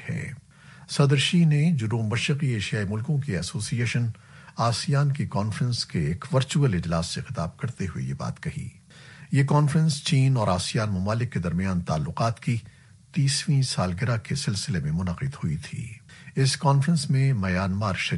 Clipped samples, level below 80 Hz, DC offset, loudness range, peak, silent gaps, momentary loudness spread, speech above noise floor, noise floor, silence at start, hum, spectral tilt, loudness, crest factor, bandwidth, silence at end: under 0.1%; -50 dBFS; under 0.1%; 3 LU; -6 dBFS; none; 11 LU; 25 dB; -49 dBFS; 0 s; none; -5.5 dB/octave; -25 LUFS; 18 dB; 11.5 kHz; 0 s